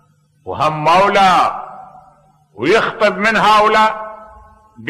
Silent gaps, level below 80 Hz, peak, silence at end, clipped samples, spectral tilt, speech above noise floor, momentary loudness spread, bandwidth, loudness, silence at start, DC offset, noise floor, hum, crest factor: none; -48 dBFS; -4 dBFS; 0 s; under 0.1%; -4.5 dB/octave; 38 dB; 18 LU; 13.5 kHz; -13 LUFS; 0.45 s; under 0.1%; -50 dBFS; none; 12 dB